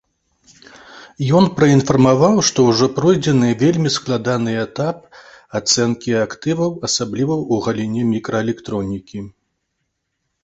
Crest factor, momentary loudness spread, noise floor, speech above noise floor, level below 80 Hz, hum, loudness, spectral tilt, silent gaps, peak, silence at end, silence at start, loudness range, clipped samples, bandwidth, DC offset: 16 dB; 11 LU; -73 dBFS; 57 dB; -50 dBFS; none; -17 LUFS; -5 dB/octave; none; -2 dBFS; 1.15 s; 0.9 s; 7 LU; under 0.1%; 8.2 kHz; under 0.1%